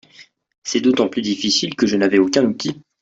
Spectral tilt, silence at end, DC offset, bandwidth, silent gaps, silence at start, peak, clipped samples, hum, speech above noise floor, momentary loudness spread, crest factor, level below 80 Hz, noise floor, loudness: -4 dB/octave; 0.2 s; under 0.1%; 8 kHz; 0.58-0.62 s; 0.2 s; -2 dBFS; under 0.1%; none; 31 dB; 10 LU; 16 dB; -58 dBFS; -48 dBFS; -18 LUFS